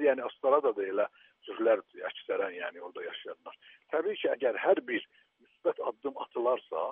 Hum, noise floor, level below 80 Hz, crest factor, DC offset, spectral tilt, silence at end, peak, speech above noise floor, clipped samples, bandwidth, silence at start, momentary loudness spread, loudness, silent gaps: none; -67 dBFS; under -90 dBFS; 20 dB; under 0.1%; -1 dB/octave; 0 s; -12 dBFS; 36 dB; under 0.1%; 3.8 kHz; 0 s; 15 LU; -32 LUFS; none